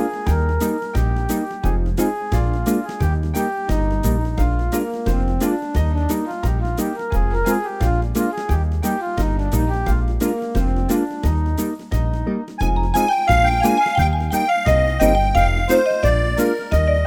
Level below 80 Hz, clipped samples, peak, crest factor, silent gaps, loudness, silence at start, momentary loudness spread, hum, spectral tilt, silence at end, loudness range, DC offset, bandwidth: -22 dBFS; under 0.1%; -2 dBFS; 16 dB; none; -20 LUFS; 0 s; 6 LU; none; -6.5 dB/octave; 0 s; 4 LU; under 0.1%; over 20 kHz